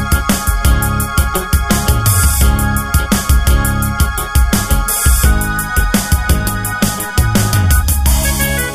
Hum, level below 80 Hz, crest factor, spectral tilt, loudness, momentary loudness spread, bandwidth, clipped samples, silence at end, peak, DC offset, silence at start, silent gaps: none; -16 dBFS; 12 dB; -4 dB/octave; -13 LUFS; 4 LU; 16 kHz; under 0.1%; 0 s; 0 dBFS; under 0.1%; 0 s; none